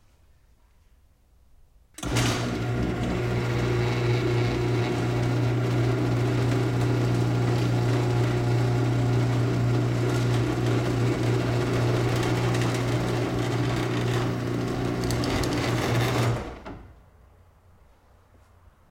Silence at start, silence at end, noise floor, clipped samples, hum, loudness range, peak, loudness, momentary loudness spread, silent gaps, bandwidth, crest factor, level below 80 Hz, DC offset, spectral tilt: 2 s; 2 s; -59 dBFS; under 0.1%; none; 4 LU; -12 dBFS; -25 LUFS; 4 LU; none; 15.5 kHz; 14 dB; -42 dBFS; under 0.1%; -6.5 dB/octave